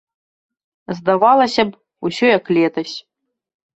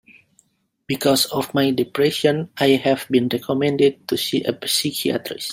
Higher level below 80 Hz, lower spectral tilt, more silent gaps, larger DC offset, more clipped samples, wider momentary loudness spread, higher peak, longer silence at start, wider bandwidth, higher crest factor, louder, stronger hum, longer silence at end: about the same, -62 dBFS vs -62 dBFS; first, -5.5 dB/octave vs -4 dB/octave; neither; neither; neither; first, 15 LU vs 5 LU; about the same, -2 dBFS vs -2 dBFS; about the same, 0.9 s vs 0.9 s; second, 8.2 kHz vs 16.5 kHz; about the same, 18 dB vs 18 dB; first, -16 LUFS vs -20 LUFS; neither; first, 0.75 s vs 0 s